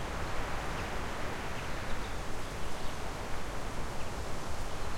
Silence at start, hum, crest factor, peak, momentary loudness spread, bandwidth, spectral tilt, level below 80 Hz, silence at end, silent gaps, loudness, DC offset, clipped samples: 0 s; none; 14 dB; -20 dBFS; 3 LU; 15.5 kHz; -4.5 dB/octave; -42 dBFS; 0 s; none; -39 LUFS; under 0.1%; under 0.1%